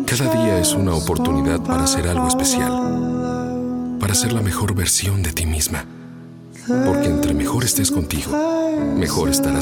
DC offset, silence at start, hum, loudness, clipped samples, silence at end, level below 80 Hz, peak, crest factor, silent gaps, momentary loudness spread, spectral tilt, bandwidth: under 0.1%; 0 s; none; -19 LUFS; under 0.1%; 0 s; -34 dBFS; 0 dBFS; 18 dB; none; 7 LU; -4.5 dB/octave; 19.5 kHz